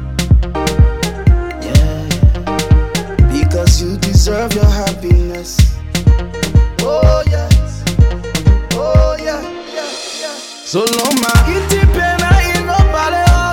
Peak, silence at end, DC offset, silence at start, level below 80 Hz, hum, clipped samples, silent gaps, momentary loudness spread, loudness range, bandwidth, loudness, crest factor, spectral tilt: 0 dBFS; 0 s; under 0.1%; 0 s; -14 dBFS; none; 0.2%; none; 8 LU; 2 LU; 17.5 kHz; -13 LUFS; 12 dB; -5.5 dB/octave